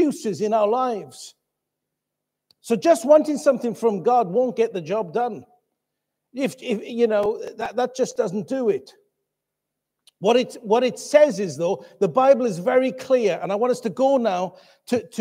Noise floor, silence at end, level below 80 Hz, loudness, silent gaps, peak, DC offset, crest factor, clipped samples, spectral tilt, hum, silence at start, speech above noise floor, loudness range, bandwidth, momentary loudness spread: -82 dBFS; 0 s; -70 dBFS; -21 LUFS; none; -2 dBFS; under 0.1%; 20 dB; under 0.1%; -5.5 dB/octave; none; 0 s; 62 dB; 5 LU; 15.5 kHz; 11 LU